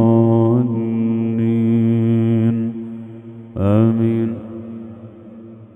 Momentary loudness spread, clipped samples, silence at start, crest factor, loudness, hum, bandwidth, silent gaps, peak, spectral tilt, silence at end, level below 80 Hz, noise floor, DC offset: 21 LU; under 0.1%; 0 s; 16 dB; -17 LUFS; none; 3.7 kHz; none; -2 dBFS; -11.5 dB/octave; 0.1 s; -54 dBFS; -38 dBFS; under 0.1%